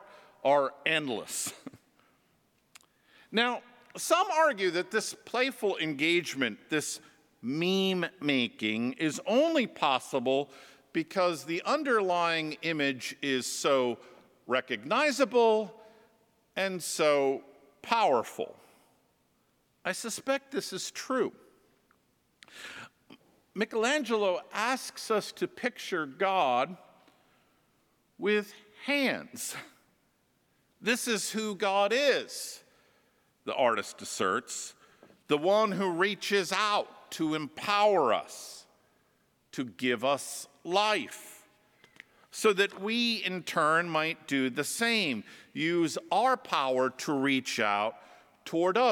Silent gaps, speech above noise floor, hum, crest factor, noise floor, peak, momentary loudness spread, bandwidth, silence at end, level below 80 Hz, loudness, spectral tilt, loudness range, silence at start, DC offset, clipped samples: none; 42 dB; none; 22 dB; -71 dBFS; -10 dBFS; 13 LU; 19 kHz; 0 s; -84 dBFS; -29 LUFS; -3 dB/octave; 5 LU; 0 s; under 0.1%; under 0.1%